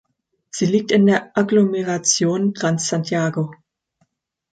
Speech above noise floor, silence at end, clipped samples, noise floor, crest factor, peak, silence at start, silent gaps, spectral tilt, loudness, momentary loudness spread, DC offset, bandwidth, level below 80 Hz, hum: 49 dB; 1 s; under 0.1%; -67 dBFS; 16 dB; -4 dBFS; 0.55 s; none; -4.5 dB/octave; -19 LUFS; 8 LU; under 0.1%; 9.2 kHz; -64 dBFS; none